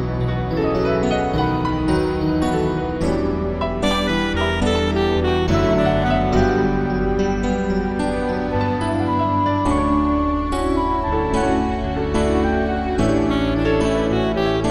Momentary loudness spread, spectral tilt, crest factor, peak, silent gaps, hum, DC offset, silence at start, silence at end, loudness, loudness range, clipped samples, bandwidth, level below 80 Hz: 4 LU; -6.5 dB/octave; 14 dB; -4 dBFS; none; none; under 0.1%; 0 s; 0 s; -19 LUFS; 2 LU; under 0.1%; 12.5 kHz; -28 dBFS